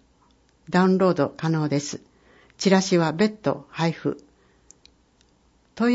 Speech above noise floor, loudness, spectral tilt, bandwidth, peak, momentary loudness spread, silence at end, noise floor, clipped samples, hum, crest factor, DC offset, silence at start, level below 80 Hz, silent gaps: 39 dB; -23 LUFS; -6 dB/octave; 8 kHz; -6 dBFS; 11 LU; 0 s; -61 dBFS; under 0.1%; none; 18 dB; under 0.1%; 0.7 s; -62 dBFS; none